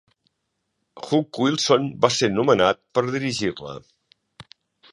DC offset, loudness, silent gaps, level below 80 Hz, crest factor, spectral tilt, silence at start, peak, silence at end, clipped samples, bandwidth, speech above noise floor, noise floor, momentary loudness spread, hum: under 0.1%; -21 LUFS; none; -58 dBFS; 22 dB; -4.5 dB/octave; 0.95 s; -2 dBFS; 0.5 s; under 0.1%; 11.5 kHz; 55 dB; -76 dBFS; 17 LU; none